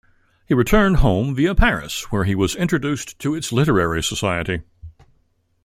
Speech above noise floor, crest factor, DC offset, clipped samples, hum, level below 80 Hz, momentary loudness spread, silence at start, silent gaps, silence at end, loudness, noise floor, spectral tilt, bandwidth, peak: 45 dB; 18 dB; under 0.1%; under 0.1%; none; -28 dBFS; 9 LU; 0.5 s; none; 0.75 s; -19 LUFS; -63 dBFS; -5.5 dB/octave; 16 kHz; -2 dBFS